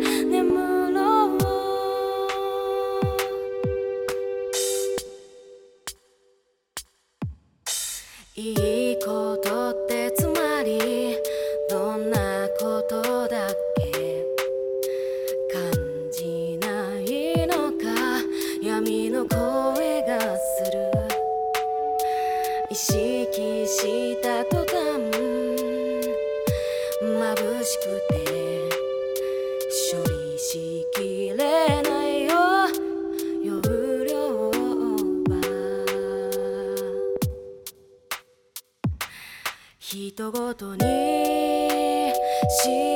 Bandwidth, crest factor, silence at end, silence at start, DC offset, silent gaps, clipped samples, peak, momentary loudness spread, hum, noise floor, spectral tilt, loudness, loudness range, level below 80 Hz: 19 kHz; 18 dB; 0 s; 0 s; under 0.1%; none; under 0.1%; -8 dBFS; 9 LU; none; -66 dBFS; -4.5 dB/octave; -25 LUFS; 7 LU; -48 dBFS